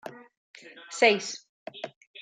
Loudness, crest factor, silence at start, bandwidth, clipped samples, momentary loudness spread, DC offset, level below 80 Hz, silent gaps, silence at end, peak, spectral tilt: -24 LUFS; 24 dB; 0.05 s; 9.4 kHz; under 0.1%; 24 LU; under 0.1%; -88 dBFS; 0.37-0.54 s, 1.49-1.66 s, 1.96-2.01 s, 2.07-2.14 s; 0 s; -8 dBFS; -2 dB/octave